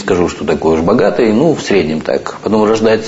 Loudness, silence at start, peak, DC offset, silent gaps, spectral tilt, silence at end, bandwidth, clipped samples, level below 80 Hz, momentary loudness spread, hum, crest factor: -12 LUFS; 0 s; 0 dBFS; under 0.1%; none; -6 dB/octave; 0 s; 8 kHz; under 0.1%; -40 dBFS; 5 LU; none; 12 dB